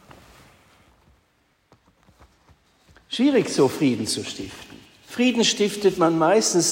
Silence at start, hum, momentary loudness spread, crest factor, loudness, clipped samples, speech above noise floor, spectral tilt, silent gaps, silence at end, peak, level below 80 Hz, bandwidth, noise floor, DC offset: 3.1 s; none; 16 LU; 16 dB; -21 LUFS; under 0.1%; 45 dB; -3.5 dB/octave; none; 0 s; -6 dBFS; -60 dBFS; 16 kHz; -65 dBFS; under 0.1%